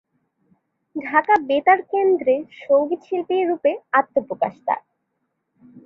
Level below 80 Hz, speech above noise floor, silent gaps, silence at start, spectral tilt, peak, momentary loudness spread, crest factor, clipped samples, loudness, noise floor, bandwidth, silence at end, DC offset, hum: -70 dBFS; 55 dB; none; 0.95 s; -6.5 dB/octave; -2 dBFS; 9 LU; 18 dB; under 0.1%; -20 LUFS; -74 dBFS; 5.8 kHz; 0.05 s; under 0.1%; none